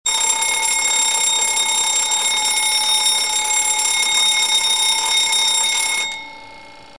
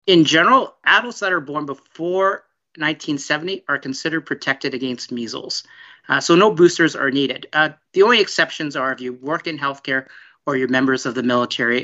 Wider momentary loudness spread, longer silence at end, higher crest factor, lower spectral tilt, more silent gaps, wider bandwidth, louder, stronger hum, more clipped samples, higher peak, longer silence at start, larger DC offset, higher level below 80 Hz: second, 2 LU vs 13 LU; first, 0.15 s vs 0 s; about the same, 16 dB vs 18 dB; second, 3.5 dB/octave vs -4 dB/octave; neither; first, 11 kHz vs 8 kHz; first, -14 LUFS vs -18 LUFS; neither; neither; about the same, -2 dBFS vs 0 dBFS; about the same, 0.05 s vs 0.05 s; first, 0.5% vs under 0.1%; first, -56 dBFS vs -70 dBFS